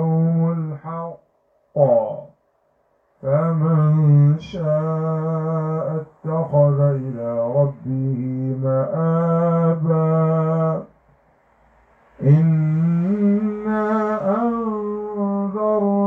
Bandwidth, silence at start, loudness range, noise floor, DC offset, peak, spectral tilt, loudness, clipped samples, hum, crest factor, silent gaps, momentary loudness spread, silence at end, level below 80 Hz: 3.5 kHz; 0 s; 2 LU; -64 dBFS; under 0.1%; -2 dBFS; -11.5 dB/octave; -20 LUFS; under 0.1%; none; 16 dB; none; 10 LU; 0 s; -58 dBFS